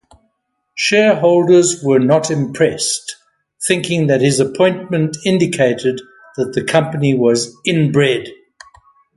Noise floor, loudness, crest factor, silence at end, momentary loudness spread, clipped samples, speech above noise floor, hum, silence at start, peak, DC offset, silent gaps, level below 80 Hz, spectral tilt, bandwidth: -69 dBFS; -15 LUFS; 14 dB; 0.8 s; 10 LU; under 0.1%; 55 dB; none; 0.75 s; 0 dBFS; under 0.1%; none; -56 dBFS; -5 dB/octave; 12 kHz